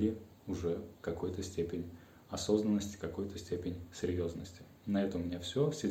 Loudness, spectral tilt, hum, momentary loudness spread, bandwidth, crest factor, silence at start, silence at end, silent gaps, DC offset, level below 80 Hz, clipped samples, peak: -38 LUFS; -6 dB/octave; none; 12 LU; 16.5 kHz; 20 dB; 0 s; 0 s; none; under 0.1%; -64 dBFS; under 0.1%; -16 dBFS